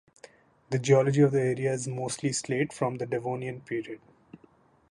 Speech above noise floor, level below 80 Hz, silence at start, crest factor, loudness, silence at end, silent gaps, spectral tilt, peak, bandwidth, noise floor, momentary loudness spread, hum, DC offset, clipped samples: 34 dB; -68 dBFS; 0.7 s; 20 dB; -28 LUFS; 0.95 s; none; -6 dB/octave; -8 dBFS; 11.5 kHz; -61 dBFS; 12 LU; none; under 0.1%; under 0.1%